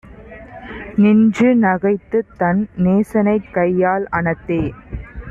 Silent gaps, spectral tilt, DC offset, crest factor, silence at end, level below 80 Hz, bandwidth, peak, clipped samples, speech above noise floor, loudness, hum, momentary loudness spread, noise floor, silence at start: none; -9 dB/octave; under 0.1%; 12 dB; 0 s; -40 dBFS; 7.6 kHz; -4 dBFS; under 0.1%; 22 dB; -16 LUFS; none; 19 LU; -37 dBFS; 0.15 s